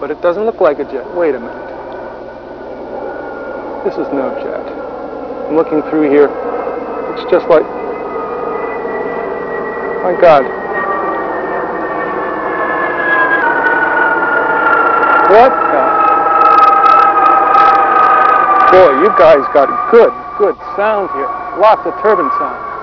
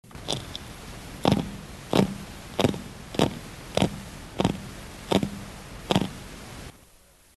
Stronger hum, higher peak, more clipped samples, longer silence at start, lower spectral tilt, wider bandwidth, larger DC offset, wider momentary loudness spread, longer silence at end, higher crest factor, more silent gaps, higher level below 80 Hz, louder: neither; first, 0 dBFS vs -4 dBFS; first, 1% vs under 0.1%; about the same, 0 s vs 0.05 s; about the same, -6.5 dB/octave vs -5.5 dB/octave; second, 5.4 kHz vs 13 kHz; neither; about the same, 17 LU vs 16 LU; second, 0 s vs 0.45 s; second, 12 dB vs 26 dB; neither; about the same, -46 dBFS vs -46 dBFS; first, -11 LUFS vs -28 LUFS